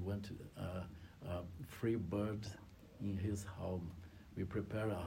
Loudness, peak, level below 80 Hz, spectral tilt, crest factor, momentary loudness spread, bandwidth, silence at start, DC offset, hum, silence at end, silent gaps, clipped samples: -44 LUFS; -26 dBFS; -64 dBFS; -7 dB/octave; 16 dB; 13 LU; 16 kHz; 0 s; under 0.1%; none; 0 s; none; under 0.1%